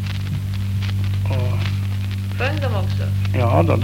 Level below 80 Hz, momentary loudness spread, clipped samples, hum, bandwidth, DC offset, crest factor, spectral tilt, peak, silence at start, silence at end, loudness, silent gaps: -38 dBFS; 7 LU; under 0.1%; none; 15.5 kHz; 0.5%; 18 dB; -7 dB/octave; -2 dBFS; 0 s; 0 s; -21 LUFS; none